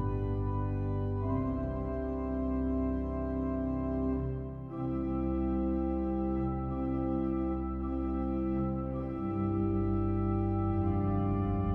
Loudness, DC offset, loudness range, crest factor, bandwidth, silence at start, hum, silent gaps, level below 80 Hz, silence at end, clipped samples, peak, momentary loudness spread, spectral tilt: -33 LUFS; under 0.1%; 2 LU; 12 dB; 3.5 kHz; 0 s; none; none; -40 dBFS; 0 s; under 0.1%; -20 dBFS; 4 LU; -12 dB/octave